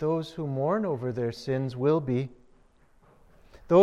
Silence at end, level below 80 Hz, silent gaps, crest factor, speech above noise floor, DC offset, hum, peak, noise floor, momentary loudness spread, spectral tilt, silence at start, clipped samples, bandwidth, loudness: 0 s; -60 dBFS; none; 18 dB; 32 dB; under 0.1%; none; -10 dBFS; -60 dBFS; 6 LU; -8.5 dB/octave; 0 s; under 0.1%; 11.5 kHz; -29 LUFS